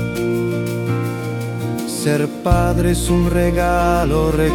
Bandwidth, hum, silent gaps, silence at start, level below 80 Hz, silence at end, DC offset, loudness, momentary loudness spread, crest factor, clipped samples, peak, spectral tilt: 18 kHz; none; none; 0 s; -26 dBFS; 0 s; under 0.1%; -18 LUFS; 7 LU; 16 dB; under 0.1%; -2 dBFS; -6 dB/octave